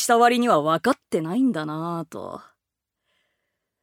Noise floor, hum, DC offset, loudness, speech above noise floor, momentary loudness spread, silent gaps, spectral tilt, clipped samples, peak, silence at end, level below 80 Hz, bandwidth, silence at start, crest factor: -84 dBFS; none; under 0.1%; -22 LUFS; 62 dB; 18 LU; none; -4.5 dB/octave; under 0.1%; -4 dBFS; 1.4 s; -74 dBFS; 16.5 kHz; 0 s; 18 dB